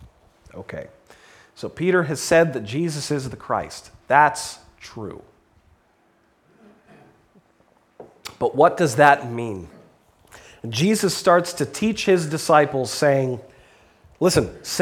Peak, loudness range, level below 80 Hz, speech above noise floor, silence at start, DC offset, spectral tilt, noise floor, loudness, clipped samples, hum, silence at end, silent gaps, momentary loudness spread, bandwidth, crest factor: 0 dBFS; 5 LU; -54 dBFS; 41 dB; 0 s; under 0.1%; -4.5 dB/octave; -61 dBFS; -20 LUFS; under 0.1%; none; 0 s; none; 19 LU; 18 kHz; 22 dB